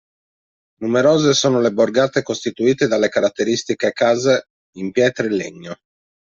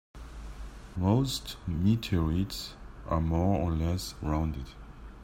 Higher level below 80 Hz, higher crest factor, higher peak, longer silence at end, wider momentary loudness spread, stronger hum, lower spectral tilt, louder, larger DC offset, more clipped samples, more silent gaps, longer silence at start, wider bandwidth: second, -60 dBFS vs -42 dBFS; about the same, 16 dB vs 18 dB; first, -2 dBFS vs -12 dBFS; first, 0.5 s vs 0 s; second, 13 LU vs 19 LU; neither; second, -4.5 dB/octave vs -6.5 dB/octave; first, -17 LUFS vs -30 LUFS; neither; neither; first, 4.50-4.73 s vs none; first, 0.8 s vs 0.15 s; second, 7.8 kHz vs 16 kHz